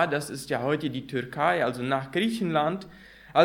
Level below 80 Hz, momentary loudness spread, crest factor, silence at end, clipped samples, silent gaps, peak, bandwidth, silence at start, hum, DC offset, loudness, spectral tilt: -62 dBFS; 7 LU; 22 dB; 0 s; under 0.1%; none; -6 dBFS; 17 kHz; 0 s; none; under 0.1%; -28 LUFS; -5.5 dB/octave